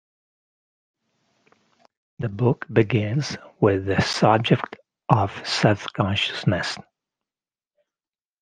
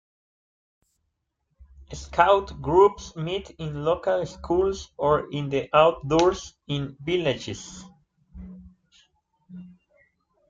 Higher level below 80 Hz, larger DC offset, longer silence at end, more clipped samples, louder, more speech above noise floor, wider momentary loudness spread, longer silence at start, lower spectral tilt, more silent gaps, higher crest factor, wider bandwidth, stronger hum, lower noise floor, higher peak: second, -58 dBFS vs -48 dBFS; neither; first, 1.6 s vs 0.8 s; neither; about the same, -22 LUFS vs -24 LUFS; first, over 69 dB vs 54 dB; second, 12 LU vs 24 LU; first, 2.2 s vs 1.8 s; about the same, -6 dB/octave vs -5.5 dB/octave; neither; about the same, 24 dB vs 22 dB; first, 9.6 kHz vs 7.8 kHz; neither; first, under -90 dBFS vs -77 dBFS; first, 0 dBFS vs -4 dBFS